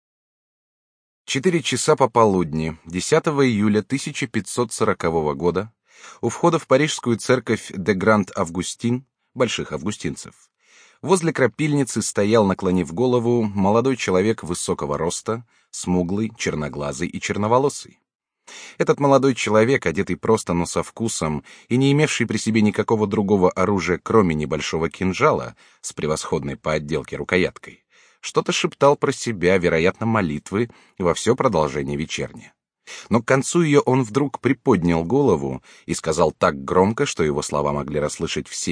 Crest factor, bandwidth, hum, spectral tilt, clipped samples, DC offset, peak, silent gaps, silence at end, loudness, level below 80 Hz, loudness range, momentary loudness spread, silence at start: 20 dB; 10.5 kHz; none; -5 dB/octave; under 0.1%; under 0.1%; -2 dBFS; 18.15-18.19 s; 0 s; -21 LUFS; -48 dBFS; 4 LU; 10 LU; 1.3 s